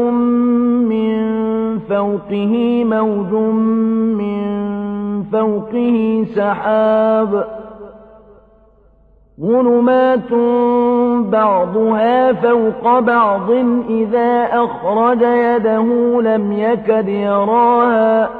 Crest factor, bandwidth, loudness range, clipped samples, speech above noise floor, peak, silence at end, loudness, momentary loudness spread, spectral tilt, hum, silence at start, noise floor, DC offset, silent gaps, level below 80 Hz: 12 dB; 4.3 kHz; 4 LU; under 0.1%; 35 dB; -2 dBFS; 0 s; -14 LUFS; 7 LU; -10 dB/octave; none; 0 s; -49 dBFS; under 0.1%; none; -52 dBFS